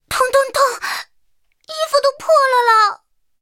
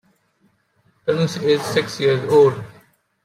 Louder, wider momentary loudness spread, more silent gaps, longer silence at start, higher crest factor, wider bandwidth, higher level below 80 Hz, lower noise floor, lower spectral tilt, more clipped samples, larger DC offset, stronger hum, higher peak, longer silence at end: first, -15 LUFS vs -18 LUFS; about the same, 13 LU vs 14 LU; neither; second, 0.1 s vs 1.05 s; about the same, 16 dB vs 16 dB; first, 17 kHz vs 14.5 kHz; first, -56 dBFS vs -64 dBFS; about the same, -65 dBFS vs -63 dBFS; second, 0 dB/octave vs -5.5 dB/octave; neither; neither; neither; about the same, -2 dBFS vs -4 dBFS; about the same, 0.45 s vs 0.55 s